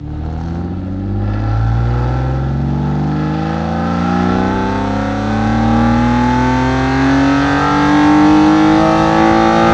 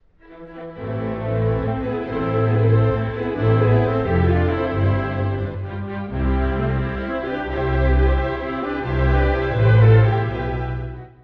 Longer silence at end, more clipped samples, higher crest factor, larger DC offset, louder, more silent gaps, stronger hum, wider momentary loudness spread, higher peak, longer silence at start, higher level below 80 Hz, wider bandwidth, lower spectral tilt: second, 0 s vs 0.15 s; neither; about the same, 12 dB vs 16 dB; neither; first, -13 LUFS vs -20 LUFS; neither; neither; about the same, 10 LU vs 11 LU; first, 0 dBFS vs -4 dBFS; second, 0 s vs 0.3 s; about the same, -26 dBFS vs -28 dBFS; first, 8.6 kHz vs 4.8 kHz; second, -7 dB/octave vs -10 dB/octave